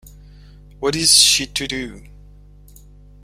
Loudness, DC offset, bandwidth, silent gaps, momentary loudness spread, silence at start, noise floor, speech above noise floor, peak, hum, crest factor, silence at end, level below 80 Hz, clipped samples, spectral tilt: -14 LUFS; under 0.1%; 16 kHz; none; 17 LU; 0.05 s; -44 dBFS; 27 dB; 0 dBFS; 50 Hz at -40 dBFS; 22 dB; 1.25 s; -42 dBFS; under 0.1%; -1 dB/octave